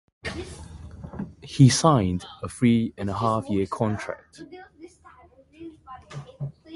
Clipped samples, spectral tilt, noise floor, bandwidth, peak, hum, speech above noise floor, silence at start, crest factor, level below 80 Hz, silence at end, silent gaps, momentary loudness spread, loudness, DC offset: under 0.1%; -6 dB/octave; -53 dBFS; 11.5 kHz; -4 dBFS; none; 30 dB; 0.25 s; 22 dB; -48 dBFS; 0 s; none; 25 LU; -23 LUFS; under 0.1%